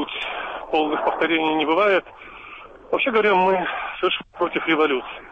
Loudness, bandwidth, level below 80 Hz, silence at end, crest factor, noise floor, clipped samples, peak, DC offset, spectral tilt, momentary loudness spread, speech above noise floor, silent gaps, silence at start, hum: -21 LUFS; 8 kHz; -54 dBFS; 0 s; 14 dB; -41 dBFS; under 0.1%; -8 dBFS; under 0.1%; -6 dB/octave; 20 LU; 21 dB; none; 0 s; none